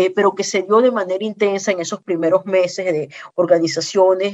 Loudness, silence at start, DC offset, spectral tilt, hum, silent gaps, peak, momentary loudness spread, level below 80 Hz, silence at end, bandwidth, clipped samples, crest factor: -18 LUFS; 0 s; under 0.1%; -4 dB/octave; none; none; -2 dBFS; 8 LU; -72 dBFS; 0 s; 8.4 kHz; under 0.1%; 16 dB